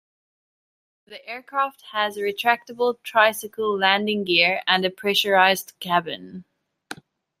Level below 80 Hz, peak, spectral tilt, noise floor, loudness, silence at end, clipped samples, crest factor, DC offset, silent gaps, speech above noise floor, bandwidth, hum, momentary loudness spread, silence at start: -74 dBFS; -2 dBFS; -3 dB/octave; -42 dBFS; -21 LUFS; 0.45 s; under 0.1%; 22 dB; under 0.1%; none; 20 dB; 16 kHz; none; 19 LU; 1.1 s